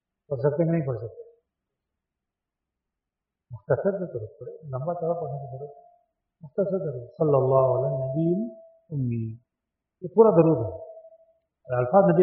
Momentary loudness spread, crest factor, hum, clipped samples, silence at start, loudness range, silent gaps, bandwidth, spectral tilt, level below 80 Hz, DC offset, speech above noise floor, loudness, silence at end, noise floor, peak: 21 LU; 22 dB; none; under 0.1%; 0.3 s; 9 LU; none; 2.9 kHz; -7 dB/octave; -62 dBFS; under 0.1%; 63 dB; -25 LUFS; 0 s; -87 dBFS; -4 dBFS